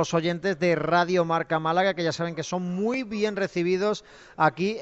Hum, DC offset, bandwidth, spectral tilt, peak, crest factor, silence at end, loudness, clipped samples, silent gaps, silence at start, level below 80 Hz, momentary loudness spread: none; under 0.1%; 8.2 kHz; -5.5 dB/octave; -8 dBFS; 18 dB; 0 s; -25 LUFS; under 0.1%; none; 0 s; -62 dBFS; 7 LU